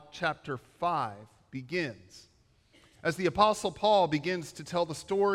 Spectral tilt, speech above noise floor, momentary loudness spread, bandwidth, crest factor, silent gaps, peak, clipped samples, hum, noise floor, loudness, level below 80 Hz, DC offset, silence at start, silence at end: -5 dB/octave; 34 dB; 15 LU; 15.5 kHz; 22 dB; none; -10 dBFS; under 0.1%; none; -64 dBFS; -30 LUFS; -62 dBFS; under 0.1%; 0.15 s; 0 s